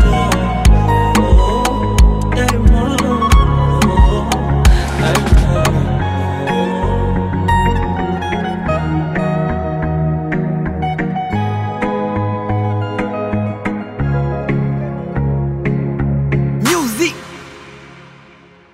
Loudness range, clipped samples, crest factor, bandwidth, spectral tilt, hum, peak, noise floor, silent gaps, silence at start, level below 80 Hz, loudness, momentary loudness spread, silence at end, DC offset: 6 LU; under 0.1%; 14 dB; 15.5 kHz; -6 dB/octave; none; 0 dBFS; -43 dBFS; none; 0 s; -18 dBFS; -16 LUFS; 7 LU; 0.7 s; under 0.1%